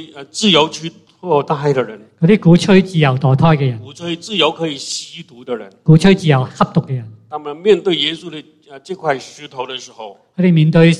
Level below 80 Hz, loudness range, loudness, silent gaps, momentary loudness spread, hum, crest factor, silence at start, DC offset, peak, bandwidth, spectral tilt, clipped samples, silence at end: -46 dBFS; 5 LU; -14 LUFS; none; 20 LU; none; 14 dB; 0 s; under 0.1%; 0 dBFS; 10.5 kHz; -6 dB/octave; under 0.1%; 0 s